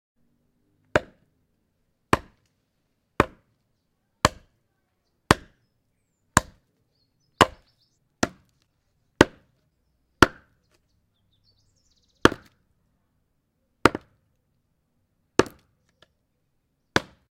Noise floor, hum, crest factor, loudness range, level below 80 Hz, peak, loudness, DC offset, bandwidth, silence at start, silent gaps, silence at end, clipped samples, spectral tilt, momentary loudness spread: -73 dBFS; none; 30 dB; 4 LU; -48 dBFS; 0 dBFS; -24 LUFS; under 0.1%; 16.5 kHz; 0.95 s; none; 0.3 s; under 0.1%; -4 dB/octave; 9 LU